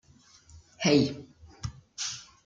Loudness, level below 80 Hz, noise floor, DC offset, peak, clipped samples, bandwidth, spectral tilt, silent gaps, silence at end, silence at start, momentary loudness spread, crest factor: -28 LUFS; -56 dBFS; -58 dBFS; under 0.1%; -10 dBFS; under 0.1%; 9.4 kHz; -4.5 dB/octave; none; 0.25 s; 0.55 s; 18 LU; 22 dB